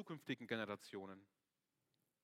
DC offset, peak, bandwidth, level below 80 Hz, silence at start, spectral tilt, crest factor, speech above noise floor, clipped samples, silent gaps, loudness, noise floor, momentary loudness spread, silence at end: under 0.1%; -26 dBFS; 16 kHz; under -90 dBFS; 0 s; -5.5 dB/octave; 24 dB; 41 dB; under 0.1%; none; -48 LUFS; -90 dBFS; 12 LU; 1 s